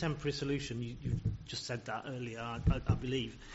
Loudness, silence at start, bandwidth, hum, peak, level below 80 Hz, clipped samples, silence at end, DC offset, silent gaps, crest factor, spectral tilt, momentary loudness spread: -37 LUFS; 0 s; 8 kHz; none; -18 dBFS; -46 dBFS; under 0.1%; 0 s; under 0.1%; none; 20 dB; -5.5 dB/octave; 7 LU